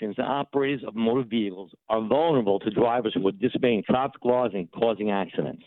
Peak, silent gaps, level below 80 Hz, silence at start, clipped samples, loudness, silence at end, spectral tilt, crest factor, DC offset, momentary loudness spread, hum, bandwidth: -10 dBFS; none; -62 dBFS; 0 s; under 0.1%; -25 LUFS; 0.1 s; -10 dB/octave; 16 dB; under 0.1%; 6 LU; none; 4.2 kHz